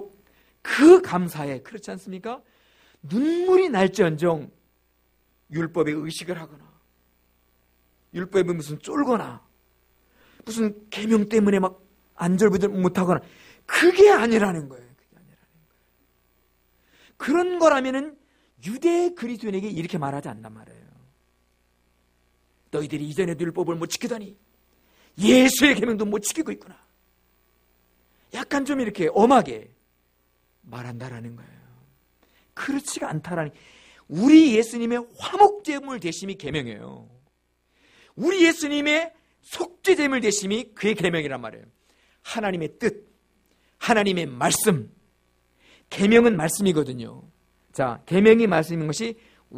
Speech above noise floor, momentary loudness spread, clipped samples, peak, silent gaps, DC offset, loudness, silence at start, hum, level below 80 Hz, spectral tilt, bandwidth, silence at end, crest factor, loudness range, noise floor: 47 dB; 20 LU; under 0.1%; -2 dBFS; none; under 0.1%; -22 LUFS; 0 s; 60 Hz at -55 dBFS; -60 dBFS; -5 dB/octave; 15.5 kHz; 0 s; 22 dB; 11 LU; -69 dBFS